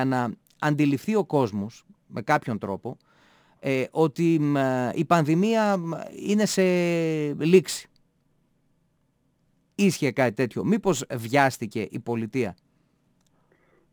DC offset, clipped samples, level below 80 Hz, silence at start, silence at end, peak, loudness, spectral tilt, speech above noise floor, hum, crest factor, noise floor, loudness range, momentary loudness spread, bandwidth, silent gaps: under 0.1%; under 0.1%; -66 dBFS; 0 s; 1.4 s; -4 dBFS; -24 LUFS; -6 dB/octave; 45 dB; none; 20 dB; -69 dBFS; 4 LU; 12 LU; over 20 kHz; none